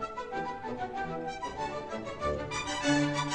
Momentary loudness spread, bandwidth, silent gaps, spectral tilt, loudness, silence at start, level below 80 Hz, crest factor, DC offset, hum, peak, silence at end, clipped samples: 9 LU; 10.5 kHz; none; -4.5 dB/octave; -34 LUFS; 0 s; -52 dBFS; 18 dB; 0.1%; none; -14 dBFS; 0 s; under 0.1%